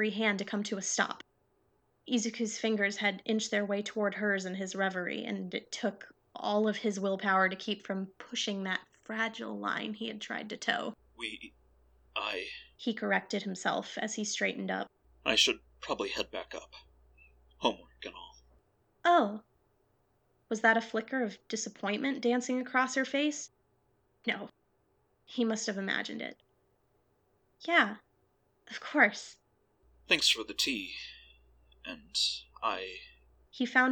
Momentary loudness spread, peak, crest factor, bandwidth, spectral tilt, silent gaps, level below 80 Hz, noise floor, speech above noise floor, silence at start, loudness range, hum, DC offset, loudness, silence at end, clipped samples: 16 LU; -8 dBFS; 26 dB; 19 kHz; -3 dB/octave; none; -70 dBFS; -73 dBFS; 41 dB; 0 s; 6 LU; none; under 0.1%; -32 LUFS; 0 s; under 0.1%